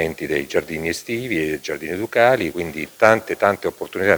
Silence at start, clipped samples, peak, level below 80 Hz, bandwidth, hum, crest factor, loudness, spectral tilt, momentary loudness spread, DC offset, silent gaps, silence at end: 0 s; under 0.1%; 0 dBFS; -52 dBFS; over 20 kHz; none; 20 dB; -20 LUFS; -5 dB/octave; 10 LU; under 0.1%; none; 0 s